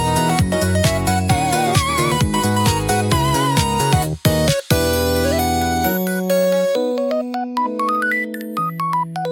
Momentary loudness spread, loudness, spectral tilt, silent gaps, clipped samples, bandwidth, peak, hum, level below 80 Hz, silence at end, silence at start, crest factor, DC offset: 5 LU; -18 LUFS; -5 dB/octave; none; under 0.1%; 17 kHz; 0 dBFS; none; -36 dBFS; 0 s; 0 s; 18 dB; under 0.1%